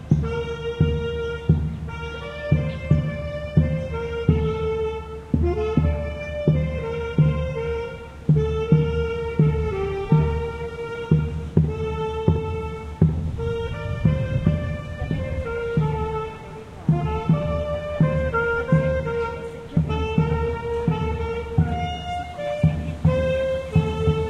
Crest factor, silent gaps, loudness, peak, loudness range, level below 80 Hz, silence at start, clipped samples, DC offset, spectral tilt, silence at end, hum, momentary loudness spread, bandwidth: 20 dB; none; -24 LUFS; -4 dBFS; 2 LU; -34 dBFS; 0 s; under 0.1%; under 0.1%; -8.5 dB/octave; 0 s; none; 9 LU; 7.4 kHz